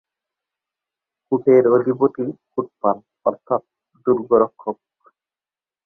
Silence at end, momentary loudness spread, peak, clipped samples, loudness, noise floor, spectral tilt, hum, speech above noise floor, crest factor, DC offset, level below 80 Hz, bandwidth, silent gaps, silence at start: 1.1 s; 14 LU; -2 dBFS; under 0.1%; -19 LUFS; under -90 dBFS; -12 dB/octave; none; over 72 dB; 18 dB; under 0.1%; -64 dBFS; 2.5 kHz; none; 1.3 s